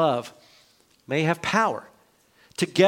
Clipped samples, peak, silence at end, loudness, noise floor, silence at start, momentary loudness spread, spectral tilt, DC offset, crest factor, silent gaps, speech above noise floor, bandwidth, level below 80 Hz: under 0.1%; -4 dBFS; 0 s; -25 LUFS; -60 dBFS; 0 s; 15 LU; -5 dB/octave; under 0.1%; 20 dB; none; 38 dB; 17 kHz; -66 dBFS